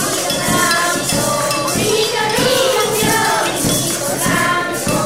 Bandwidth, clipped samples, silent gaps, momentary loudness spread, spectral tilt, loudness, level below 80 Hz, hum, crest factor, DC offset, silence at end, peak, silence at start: 16.5 kHz; under 0.1%; none; 3 LU; -2.5 dB/octave; -15 LUFS; -42 dBFS; none; 14 dB; 0.4%; 0 s; -2 dBFS; 0 s